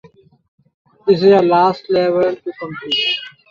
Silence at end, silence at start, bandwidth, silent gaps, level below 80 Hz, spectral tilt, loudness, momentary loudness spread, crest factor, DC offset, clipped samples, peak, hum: 0.2 s; 1.05 s; 7 kHz; none; -60 dBFS; -6.5 dB/octave; -15 LUFS; 14 LU; 14 dB; under 0.1%; under 0.1%; -2 dBFS; none